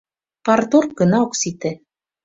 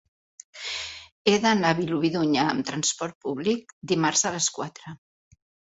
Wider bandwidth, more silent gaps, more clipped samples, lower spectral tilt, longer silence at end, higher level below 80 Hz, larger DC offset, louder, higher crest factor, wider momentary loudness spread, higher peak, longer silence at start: about the same, 7.8 kHz vs 8.2 kHz; second, none vs 1.12-1.25 s, 3.15-3.21 s, 3.73-3.81 s; neither; first, -5 dB/octave vs -3.5 dB/octave; second, 0.5 s vs 0.8 s; first, -58 dBFS vs -64 dBFS; neither; first, -18 LUFS vs -25 LUFS; second, 16 dB vs 22 dB; second, 12 LU vs 15 LU; about the same, -2 dBFS vs -4 dBFS; about the same, 0.45 s vs 0.55 s